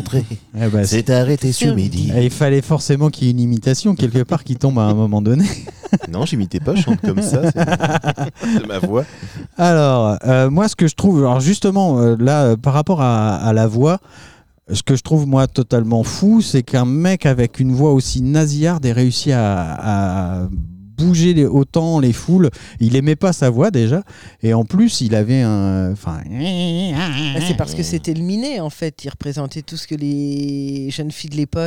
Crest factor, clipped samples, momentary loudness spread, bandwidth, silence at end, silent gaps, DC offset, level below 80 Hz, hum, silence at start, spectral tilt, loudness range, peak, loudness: 14 dB; under 0.1%; 9 LU; 14 kHz; 0 s; none; 0.6%; -40 dBFS; none; 0 s; -6.5 dB/octave; 6 LU; -2 dBFS; -16 LUFS